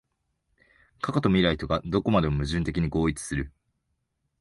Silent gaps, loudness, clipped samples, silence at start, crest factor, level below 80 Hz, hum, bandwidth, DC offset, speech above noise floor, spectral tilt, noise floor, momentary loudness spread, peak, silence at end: none; -26 LUFS; under 0.1%; 1.05 s; 20 dB; -42 dBFS; none; 11.5 kHz; under 0.1%; 52 dB; -6 dB/octave; -77 dBFS; 10 LU; -8 dBFS; 0.95 s